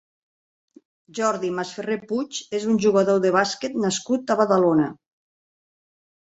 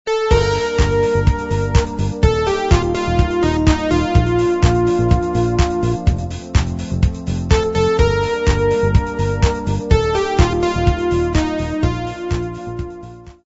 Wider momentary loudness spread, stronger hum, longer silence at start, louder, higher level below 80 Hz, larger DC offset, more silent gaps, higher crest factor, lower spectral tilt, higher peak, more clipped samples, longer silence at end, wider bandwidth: about the same, 10 LU vs 8 LU; neither; first, 1.15 s vs 0.05 s; second, -22 LUFS vs -17 LUFS; second, -66 dBFS vs -22 dBFS; neither; neither; about the same, 18 dB vs 16 dB; second, -5 dB/octave vs -6.5 dB/octave; second, -4 dBFS vs 0 dBFS; neither; first, 1.4 s vs 0.15 s; about the same, 8.2 kHz vs 8 kHz